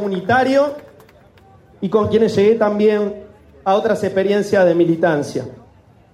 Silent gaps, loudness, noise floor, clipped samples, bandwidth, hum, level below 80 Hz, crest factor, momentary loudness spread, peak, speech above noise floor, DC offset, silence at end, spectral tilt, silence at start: none; -16 LUFS; -47 dBFS; under 0.1%; 12.5 kHz; none; -54 dBFS; 14 dB; 12 LU; -4 dBFS; 32 dB; under 0.1%; 0.55 s; -6.5 dB/octave; 0 s